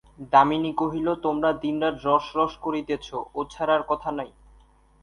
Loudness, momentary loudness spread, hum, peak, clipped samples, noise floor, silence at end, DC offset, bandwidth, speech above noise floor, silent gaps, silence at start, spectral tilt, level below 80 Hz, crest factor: -25 LUFS; 12 LU; none; -4 dBFS; under 0.1%; -56 dBFS; 0.75 s; under 0.1%; 10.5 kHz; 32 dB; none; 0.2 s; -6.5 dB/octave; -54 dBFS; 20 dB